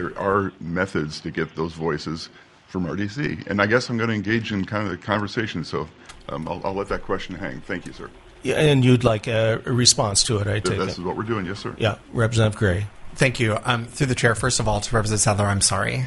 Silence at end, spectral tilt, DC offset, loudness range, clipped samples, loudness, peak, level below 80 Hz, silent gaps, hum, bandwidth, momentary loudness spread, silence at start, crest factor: 0 s; -4 dB/octave; under 0.1%; 8 LU; under 0.1%; -22 LUFS; 0 dBFS; -42 dBFS; none; none; 11.5 kHz; 14 LU; 0 s; 22 dB